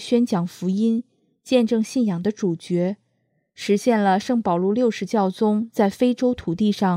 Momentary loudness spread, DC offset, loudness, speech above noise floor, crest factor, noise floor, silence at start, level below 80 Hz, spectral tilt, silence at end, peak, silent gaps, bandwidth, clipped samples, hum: 5 LU; under 0.1%; -21 LUFS; 49 dB; 16 dB; -69 dBFS; 0 s; -58 dBFS; -6.5 dB/octave; 0 s; -4 dBFS; none; 14.5 kHz; under 0.1%; none